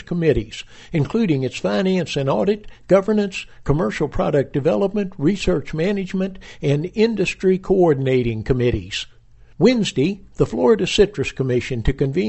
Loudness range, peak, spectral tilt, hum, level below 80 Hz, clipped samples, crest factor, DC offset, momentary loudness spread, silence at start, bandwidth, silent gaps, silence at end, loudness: 2 LU; -2 dBFS; -6.5 dB/octave; none; -36 dBFS; under 0.1%; 18 dB; under 0.1%; 9 LU; 0 s; 8.4 kHz; none; 0 s; -20 LUFS